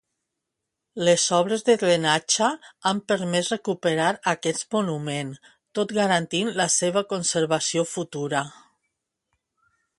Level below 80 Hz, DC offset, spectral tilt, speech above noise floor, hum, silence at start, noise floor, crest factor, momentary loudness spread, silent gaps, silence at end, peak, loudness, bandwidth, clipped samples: -68 dBFS; under 0.1%; -3 dB/octave; 59 dB; none; 0.95 s; -83 dBFS; 20 dB; 9 LU; none; 1.5 s; -4 dBFS; -23 LUFS; 11.5 kHz; under 0.1%